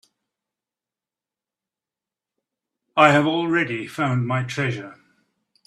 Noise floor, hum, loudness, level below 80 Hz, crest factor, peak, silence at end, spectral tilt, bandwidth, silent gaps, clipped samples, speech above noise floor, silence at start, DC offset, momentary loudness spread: -90 dBFS; none; -20 LUFS; -66 dBFS; 24 dB; -2 dBFS; 0.75 s; -6 dB/octave; 12.5 kHz; none; under 0.1%; 70 dB; 2.95 s; under 0.1%; 12 LU